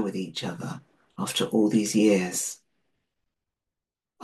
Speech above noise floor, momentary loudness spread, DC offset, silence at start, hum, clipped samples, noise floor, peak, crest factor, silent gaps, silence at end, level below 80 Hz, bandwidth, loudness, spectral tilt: 63 dB; 16 LU; under 0.1%; 0 s; none; under 0.1%; -88 dBFS; -10 dBFS; 18 dB; none; 0 s; -72 dBFS; 12.5 kHz; -25 LUFS; -4.5 dB/octave